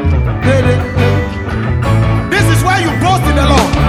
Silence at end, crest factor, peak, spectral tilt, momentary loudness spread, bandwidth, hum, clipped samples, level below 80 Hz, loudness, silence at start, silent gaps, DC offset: 0 s; 10 dB; 0 dBFS; -6 dB/octave; 5 LU; 15 kHz; none; under 0.1%; -20 dBFS; -12 LUFS; 0 s; none; under 0.1%